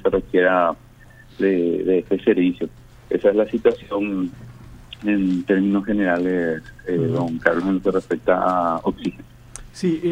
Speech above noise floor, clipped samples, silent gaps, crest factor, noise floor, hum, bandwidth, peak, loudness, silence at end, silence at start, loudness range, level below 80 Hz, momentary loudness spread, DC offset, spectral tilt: 26 dB; under 0.1%; none; 20 dB; -46 dBFS; none; 10.5 kHz; 0 dBFS; -21 LUFS; 0 s; 0 s; 2 LU; -48 dBFS; 12 LU; under 0.1%; -7.5 dB/octave